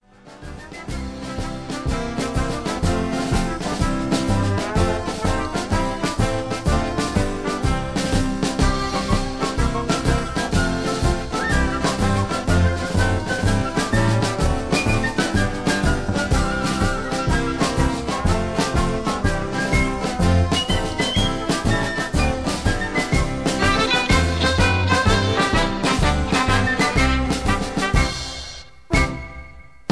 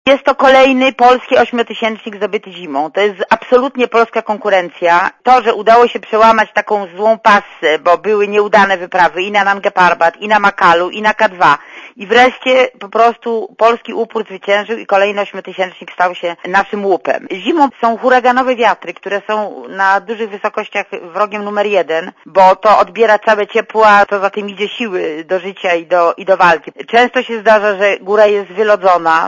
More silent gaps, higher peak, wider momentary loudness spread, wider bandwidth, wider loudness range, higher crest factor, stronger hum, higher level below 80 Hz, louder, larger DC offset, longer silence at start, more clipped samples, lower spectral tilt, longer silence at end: neither; second, -4 dBFS vs 0 dBFS; second, 7 LU vs 10 LU; first, 11 kHz vs 8.6 kHz; about the same, 4 LU vs 4 LU; about the same, 16 dB vs 12 dB; neither; first, -28 dBFS vs -52 dBFS; second, -21 LUFS vs -12 LUFS; first, 0.5% vs under 0.1%; first, 0.25 s vs 0.05 s; second, under 0.1% vs 0.4%; about the same, -5 dB/octave vs -4.5 dB/octave; first, 0.3 s vs 0 s